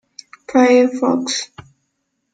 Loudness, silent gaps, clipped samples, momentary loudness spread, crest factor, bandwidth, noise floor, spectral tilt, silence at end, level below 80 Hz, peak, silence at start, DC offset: -15 LUFS; none; under 0.1%; 18 LU; 16 dB; 9.4 kHz; -71 dBFS; -3.5 dB/octave; 0.9 s; -64 dBFS; -2 dBFS; 0.5 s; under 0.1%